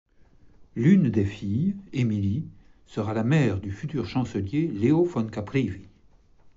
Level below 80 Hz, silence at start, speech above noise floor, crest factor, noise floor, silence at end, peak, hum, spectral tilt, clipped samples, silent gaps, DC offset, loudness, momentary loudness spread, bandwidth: -54 dBFS; 0.6 s; 32 dB; 18 dB; -56 dBFS; 0.1 s; -8 dBFS; none; -8 dB/octave; under 0.1%; none; under 0.1%; -25 LUFS; 12 LU; 7.8 kHz